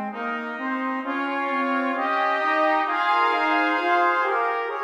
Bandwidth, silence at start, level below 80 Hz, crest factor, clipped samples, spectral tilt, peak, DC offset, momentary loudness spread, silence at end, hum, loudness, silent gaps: 11 kHz; 0 s; -82 dBFS; 14 dB; under 0.1%; -4 dB/octave; -10 dBFS; under 0.1%; 7 LU; 0 s; none; -22 LUFS; none